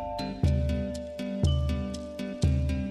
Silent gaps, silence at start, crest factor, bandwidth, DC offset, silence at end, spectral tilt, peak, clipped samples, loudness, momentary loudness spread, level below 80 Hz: none; 0 s; 14 dB; 11 kHz; under 0.1%; 0 s; -7 dB/octave; -14 dBFS; under 0.1%; -30 LUFS; 9 LU; -34 dBFS